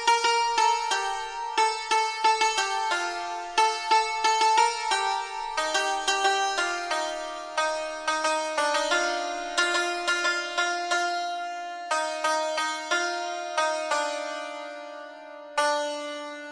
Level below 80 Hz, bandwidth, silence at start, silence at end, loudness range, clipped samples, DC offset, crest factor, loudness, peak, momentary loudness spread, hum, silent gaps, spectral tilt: -62 dBFS; 10.5 kHz; 0 s; 0 s; 4 LU; under 0.1%; under 0.1%; 18 dB; -26 LUFS; -8 dBFS; 10 LU; none; none; 1 dB/octave